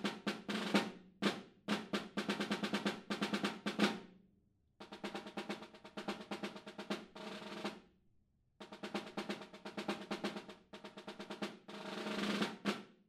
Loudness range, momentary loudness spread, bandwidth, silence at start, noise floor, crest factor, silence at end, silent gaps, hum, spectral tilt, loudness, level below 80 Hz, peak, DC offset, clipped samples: 8 LU; 14 LU; 15 kHz; 0 s; -75 dBFS; 26 dB; 0.15 s; none; none; -4.5 dB/octave; -42 LUFS; -80 dBFS; -18 dBFS; under 0.1%; under 0.1%